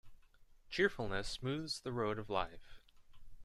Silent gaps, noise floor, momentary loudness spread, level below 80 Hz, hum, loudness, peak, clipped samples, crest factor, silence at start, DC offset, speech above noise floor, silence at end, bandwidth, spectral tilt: none; -63 dBFS; 6 LU; -56 dBFS; none; -39 LUFS; -20 dBFS; under 0.1%; 22 dB; 0.05 s; under 0.1%; 24 dB; 0 s; 13.5 kHz; -4.5 dB/octave